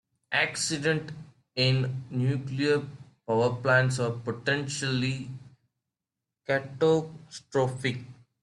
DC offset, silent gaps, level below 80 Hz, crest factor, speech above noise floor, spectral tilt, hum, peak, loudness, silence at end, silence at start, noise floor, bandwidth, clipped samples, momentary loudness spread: under 0.1%; none; -64 dBFS; 18 dB; 61 dB; -5 dB/octave; none; -10 dBFS; -28 LUFS; 0.3 s; 0.3 s; -88 dBFS; 12 kHz; under 0.1%; 17 LU